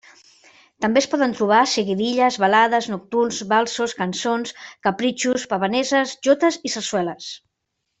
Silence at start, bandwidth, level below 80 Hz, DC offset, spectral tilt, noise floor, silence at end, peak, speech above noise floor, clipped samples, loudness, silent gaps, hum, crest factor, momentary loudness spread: 0.8 s; 8.4 kHz; -64 dBFS; under 0.1%; -3.5 dB/octave; -77 dBFS; 0.65 s; -2 dBFS; 57 dB; under 0.1%; -20 LUFS; none; none; 18 dB; 9 LU